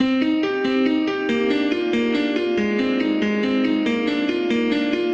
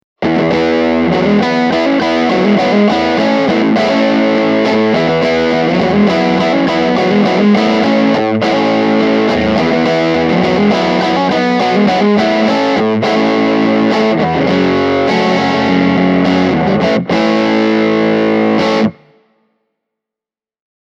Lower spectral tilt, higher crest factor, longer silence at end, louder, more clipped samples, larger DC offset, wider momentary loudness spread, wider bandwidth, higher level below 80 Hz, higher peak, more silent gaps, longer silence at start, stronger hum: about the same, -6 dB/octave vs -6.5 dB/octave; about the same, 12 dB vs 12 dB; second, 0 s vs 1.9 s; second, -20 LUFS vs -11 LUFS; neither; neither; about the same, 2 LU vs 2 LU; about the same, 8 kHz vs 7.8 kHz; second, -56 dBFS vs -44 dBFS; second, -8 dBFS vs 0 dBFS; neither; second, 0 s vs 0.2 s; neither